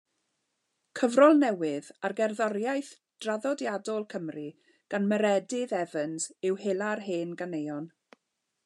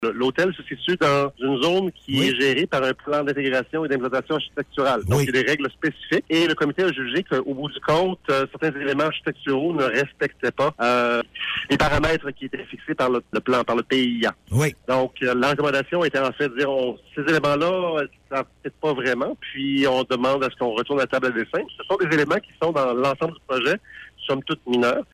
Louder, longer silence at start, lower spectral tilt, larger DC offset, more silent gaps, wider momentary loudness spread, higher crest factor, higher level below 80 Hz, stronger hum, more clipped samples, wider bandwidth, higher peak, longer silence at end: second, -29 LUFS vs -22 LUFS; first, 0.95 s vs 0 s; about the same, -5 dB/octave vs -5.5 dB/octave; neither; neither; first, 15 LU vs 7 LU; first, 22 dB vs 14 dB; second, under -90 dBFS vs -48 dBFS; neither; neither; second, 11.5 kHz vs 15.5 kHz; about the same, -8 dBFS vs -8 dBFS; first, 0.8 s vs 0.1 s